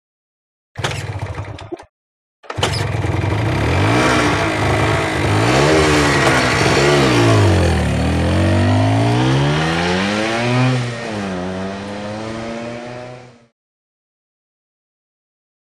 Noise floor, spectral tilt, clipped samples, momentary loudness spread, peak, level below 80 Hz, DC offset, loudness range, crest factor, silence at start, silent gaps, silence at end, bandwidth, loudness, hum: -36 dBFS; -5.5 dB/octave; under 0.1%; 15 LU; 0 dBFS; -32 dBFS; under 0.1%; 15 LU; 16 dB; 0.75 s; 1.89-2.43 s; 2.5 s; 14 kHz; -16 LUFS; none